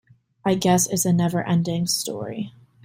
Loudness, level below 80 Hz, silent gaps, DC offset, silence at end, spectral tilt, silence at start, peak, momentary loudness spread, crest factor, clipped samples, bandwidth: -22 LUFS; -58 dBFS; none; under 0.1%; 0.35 s; -4.5 dB/octave; 0.45 s; -6 dBFS; 12 LU; 16 dB; under 0.1%; 16 kHz